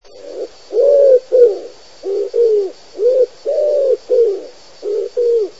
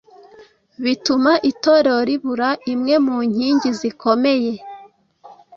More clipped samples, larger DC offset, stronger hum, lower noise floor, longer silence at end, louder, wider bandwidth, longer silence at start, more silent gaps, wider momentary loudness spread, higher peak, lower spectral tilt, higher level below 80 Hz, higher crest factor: neither; first, 0.9% vs under 0.1%; neither; second, -32 dBFS vs -47 dBFS; second, 0.1 s vs 0.25 s; first, -14 LUFS vs -18 LUFS; about the same, 7.8 kHz vs 7.6 kHz; second, 0.15 s vs 0.4 s; neither; first, 18 LU vs 7 LU; about the same, 0 dBFS vs -2 dBFS; about the same, -4 dB/octave vs -4.5 dB/octave; about the same, -64 dBFS vs -62 dBFS; about the same, 14 dB vs 16 dB